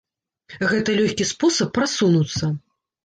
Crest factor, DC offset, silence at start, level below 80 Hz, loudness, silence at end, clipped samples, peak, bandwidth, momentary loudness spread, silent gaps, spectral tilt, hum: 14 dB; under 0.1%; 0.5 s; -52 dBFS; -20 LUFS; 0.45 s; under 0.1%; -8 dBFS; 10 kHz; 7 LU; none; -4.5 dB/octave; none